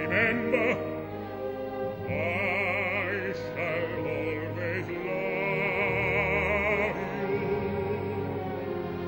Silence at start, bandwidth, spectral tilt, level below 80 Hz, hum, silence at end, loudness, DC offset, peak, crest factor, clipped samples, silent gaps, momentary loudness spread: 0 s; 16 kHz; -7 dB/octave; -50 dBFS; none; 0 s; -29 LUFS; under 0.1%; -10 dBFS; 18 dB; under 0.1%; none; 8 LU